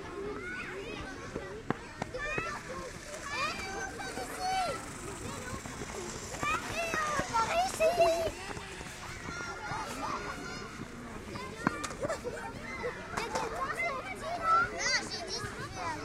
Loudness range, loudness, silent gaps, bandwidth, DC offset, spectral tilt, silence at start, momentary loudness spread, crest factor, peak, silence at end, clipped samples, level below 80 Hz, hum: 7 LU; -35 LUFS; none; 16 kHz; under 0.1%; -3.5 dB/octave; 0 s; 13 LU; 24 dB; -12 dBFS; 0 s; under 0.1%; -52 dBFS; none